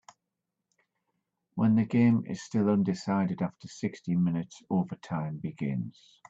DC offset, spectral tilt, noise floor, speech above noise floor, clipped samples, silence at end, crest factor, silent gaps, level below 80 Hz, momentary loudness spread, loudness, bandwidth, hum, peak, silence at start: under 0.1%; -8 dB/octave; -86 dBFS; 57 dB; under 0.1%; 0.4 s; 16 dB; none; -70 dBFS; 12 LU; -29 LUFS; 7.8 kHz; none; -14 dBFS; 1.55 s